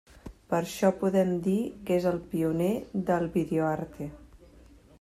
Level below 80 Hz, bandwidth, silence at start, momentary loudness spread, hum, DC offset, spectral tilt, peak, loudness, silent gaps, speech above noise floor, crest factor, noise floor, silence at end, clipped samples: -56 dBFS; 15 kHz; 0.25 s; 13 LU; none; under 0.1%; -7 dB/octave; -10 dBFS; -28 LUFS; none; 27 dB; 18 dB; -54 dBFS; 0.65 s; under 0.1%